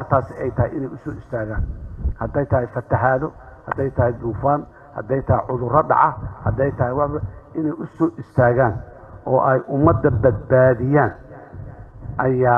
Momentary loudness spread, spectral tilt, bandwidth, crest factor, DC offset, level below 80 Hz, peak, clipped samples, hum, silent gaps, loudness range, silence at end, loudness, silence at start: 17 LU; -11.5 dB/octave; 3.4 kHz; 18 dB; under 0.1%; -36 dBFS; -2 dBFS; under 0.1%; none; none; 5 LU; 0 s; -20 LUFS; 0 s